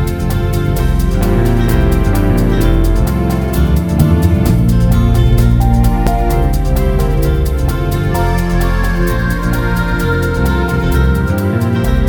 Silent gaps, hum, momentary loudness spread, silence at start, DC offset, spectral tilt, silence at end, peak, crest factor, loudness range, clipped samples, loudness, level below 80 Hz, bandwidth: none; none; 4 LU; 0 s; under 0.1%; -7 dB/octave; 0 s; 0 dBFS; 12 dB; 3 LU; under 0.1%; -13 LUFS; -14 dBFS; 19.5 kHz